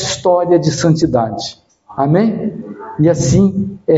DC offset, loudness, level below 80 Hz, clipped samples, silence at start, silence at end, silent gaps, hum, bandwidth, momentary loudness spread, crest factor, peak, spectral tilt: under 0.1%; -14 LUFS; -40 dBFS; under 0.1%; 0 s; 0 s; none; none; 8 kHz; 14 LU; 14 dB; 0 dBFS; -6 dB/octave